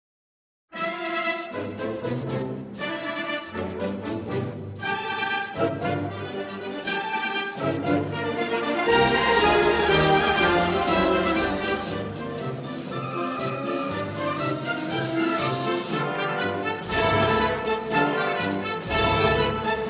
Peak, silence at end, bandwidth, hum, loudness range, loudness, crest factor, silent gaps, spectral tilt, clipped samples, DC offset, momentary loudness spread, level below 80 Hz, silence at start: -8 dBFS; 0 s; 4 kHz; none; 9 LU; -25 LUFS; 16 dB; none; -9.5 dB/octave; under 0.1%; under 0.1%; 12 LU; -46 dBFS; 0.7 s